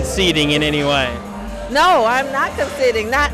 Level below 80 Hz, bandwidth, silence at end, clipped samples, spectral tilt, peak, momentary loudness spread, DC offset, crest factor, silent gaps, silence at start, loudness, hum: -32 dBFS; 15 kHz; 0 s; under 0.1%; -4 dB/octave; -8 dBFS; 10 LU; under 0.1%; 10 dB; none; 0 s; -16 LUFS; none